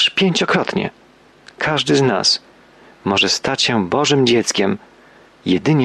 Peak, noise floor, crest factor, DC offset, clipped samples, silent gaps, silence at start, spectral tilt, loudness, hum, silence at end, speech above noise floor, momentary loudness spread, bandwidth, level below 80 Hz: -4 dBFS; -47 dBFS; 14 dB; under 0.1%; under 0.1%; none; 0 s; -4 dB/octave; -16 LUFS; none; 0 s; 31 dB; 9 LU; 12.5 kHz; -56 dBFS